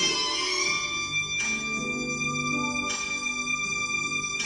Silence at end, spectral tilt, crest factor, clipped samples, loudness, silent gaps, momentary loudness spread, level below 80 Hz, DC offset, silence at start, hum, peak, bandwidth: 0 s; -1 dB/octave; 16 dB; under 0.1%; -26 LUFS; none; 3 LU; -56 dBFS; under 0.1%; 0 s; none; -12 dBFS; 12 kHz